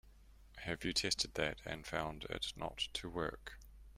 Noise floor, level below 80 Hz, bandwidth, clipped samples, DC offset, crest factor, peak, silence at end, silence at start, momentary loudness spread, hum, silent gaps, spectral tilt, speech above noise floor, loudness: -61 dBFS; -58 dBFS; 16 kHz; under 0.1%; under 0.1%; 22 dB; -20 dBFS; 0 s; 0.05 s; 16 LU; none; none; -3 dB/octave; 20 dB; -40 LUFS